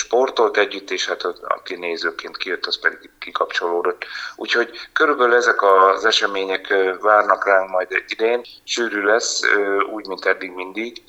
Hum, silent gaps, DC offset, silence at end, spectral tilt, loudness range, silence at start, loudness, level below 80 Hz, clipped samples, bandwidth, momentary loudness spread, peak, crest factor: none; none; under 0.1%; 0.1 s; -1 dB/octave; 7 LU; 0 s; -19 LUFS; -64 dBFS; under 0.1%; 11 kHz; 11 LU; -2 dBFS; 18 dB